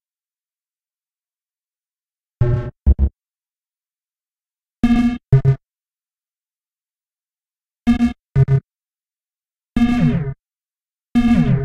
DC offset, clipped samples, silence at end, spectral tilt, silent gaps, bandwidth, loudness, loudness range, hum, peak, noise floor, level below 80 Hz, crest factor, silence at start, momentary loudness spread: under 0.1%; under 0.1%; 0 s; -9 dB/octave; none; 8 kHz; -18 LUFS; 4 LU; none; -4 dBFS; under -90 dBFS; -28 dBFS; 18 dB; 2.4 s; 8 LU